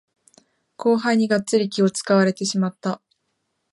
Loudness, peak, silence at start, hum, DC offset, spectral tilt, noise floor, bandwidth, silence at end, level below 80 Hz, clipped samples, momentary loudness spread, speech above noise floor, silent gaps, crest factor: -21 LUFS; -4 dBFS; 0.8 s; none; under 0.1%; -5 dB/octave; -74 dBFS; 11.5 kHz; 0.75 s; -72 dBFS; under 0.1%; 9 LU; 54 dB; none; 18 dB